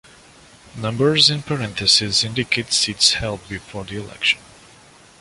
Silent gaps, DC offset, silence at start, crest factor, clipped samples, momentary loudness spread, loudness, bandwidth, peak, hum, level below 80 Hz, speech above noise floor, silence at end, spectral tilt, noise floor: none; under 0.1%; 0.75 s; 22 dB; under 0.1%; 17 LU; -17 LUFS; 11.5 kHz; 0 dBFS; none; -48 dBFS; 28 dB; 0.8 s; -2.5 dB/octave; -48 dBFS